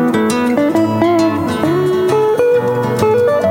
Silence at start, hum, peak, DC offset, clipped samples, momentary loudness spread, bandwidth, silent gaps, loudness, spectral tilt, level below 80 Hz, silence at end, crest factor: 0 s; none; -2 dBFS; under 0.1%; under 0.1%; 3 LU; 16.5 kHz; none; -13 LUFS; -6.5 dB/octave; -50 dBFS; 0 s; 12 dB